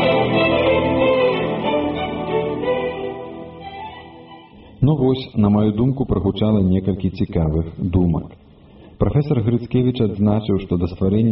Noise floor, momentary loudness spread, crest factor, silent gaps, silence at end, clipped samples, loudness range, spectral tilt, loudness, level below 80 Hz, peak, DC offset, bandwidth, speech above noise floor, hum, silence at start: -44 dBFS; 15 LU; 14 dB; none; 0 s; under 0.1%; 5 LU; -6.5 dB/octave; -19 LUFS; -38 dBFS; -4 dBFS; under 0.1%; 5.6 kHz; 27 dB; none; 0 s